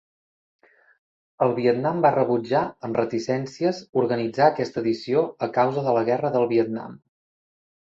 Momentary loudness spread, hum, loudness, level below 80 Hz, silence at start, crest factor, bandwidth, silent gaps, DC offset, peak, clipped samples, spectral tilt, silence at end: 6 LU; none; -23 LUFS; -66 dBFS; 1.4 s; 20 dB; 7.8 kHz; 3.89-3.93 s; under 0.1%; -4 dBFS; under 0.1%; -7 dB/octave; 0.85 s